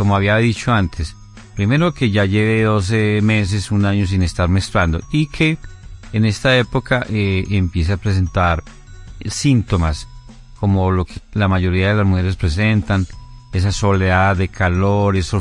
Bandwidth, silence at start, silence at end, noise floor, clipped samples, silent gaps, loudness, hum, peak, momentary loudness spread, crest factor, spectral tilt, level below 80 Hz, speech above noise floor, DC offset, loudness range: 11.5 kHz; 0 s; 0 s; -38 dBFS; under 0.1%; none; -17 LUFS; none; -2 dBFS; 7 LU; 16 dB; -6.5 dB/octave; -34 dBFS; 22 dB; under 0.1%; 3 LU